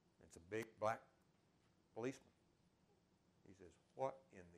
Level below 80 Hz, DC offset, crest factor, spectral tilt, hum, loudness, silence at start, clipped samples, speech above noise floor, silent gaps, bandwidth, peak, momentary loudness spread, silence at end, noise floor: -84 dBFS; under 0.1%; 24 dB; -5.5 dB/octave; none; -48 LUFS; 0.2 s; under 0.1%; 30 dB; none; 13 kHz; -30 dBFS; 21 LU; 0 s; -78 dBFS